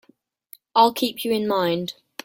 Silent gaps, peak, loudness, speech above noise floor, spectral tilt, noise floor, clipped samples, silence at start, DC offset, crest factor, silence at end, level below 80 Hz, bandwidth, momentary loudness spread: none; -2 dBFS; -21 LUFS; 40 dB; -4.5 dB/octave; -61 dBFS; under 0.1%; 0.75 s; under 0.1%; 20 dB; 0.35 s; -66 dBFS; 17 kHz; 8 LU